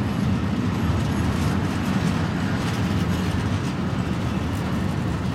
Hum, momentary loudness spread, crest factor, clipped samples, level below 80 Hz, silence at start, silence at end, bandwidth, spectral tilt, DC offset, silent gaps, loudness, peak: none; 2 LU; 12 dB; under 0.1%; -36 dBFS; 0 s; 0 s; 15.5 kHz; -6.5 dB/octave; under 0.1%; none; -24 LUFS; -10 dBFS